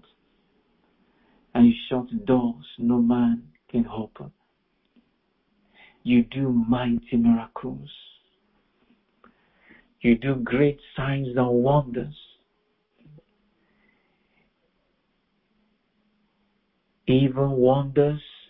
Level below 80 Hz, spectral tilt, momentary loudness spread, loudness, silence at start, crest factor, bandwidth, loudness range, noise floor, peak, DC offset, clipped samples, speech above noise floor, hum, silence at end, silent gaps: -52 dBFS; -12 dB/octave; 15 LU; -23 LUFS; 1.55 s; 20 dB; 4 kHz; 6 LU; -71 dBFS; -6 dBFS; under 0.1%; under 0.1%; 49 dB; none; 0.25 s; none